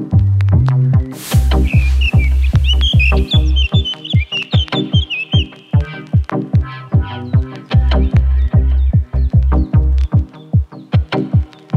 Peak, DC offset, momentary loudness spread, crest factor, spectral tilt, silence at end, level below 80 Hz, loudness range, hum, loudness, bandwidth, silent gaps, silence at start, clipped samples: -2 dBFS; under 0.1%; 6 LU; 10 dB; -6.5 dB/octave; 0 s; -16 dBFS; 3 LU; none; -15 LUFS; 13 kHz; none; 0 s; under 0.1%